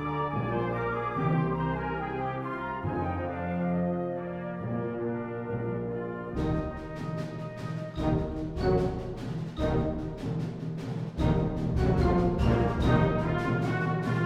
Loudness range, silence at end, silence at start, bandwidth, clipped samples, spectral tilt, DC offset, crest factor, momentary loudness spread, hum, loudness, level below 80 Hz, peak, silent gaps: 6 LU; 0 s; 0 s; 9.2 kHz; under 0.1%; -8.5 dB/octave; under 0.1%; 18 dB; 10 LU; none; -30 LUFS; -40 dBFS; -12 dBFS; none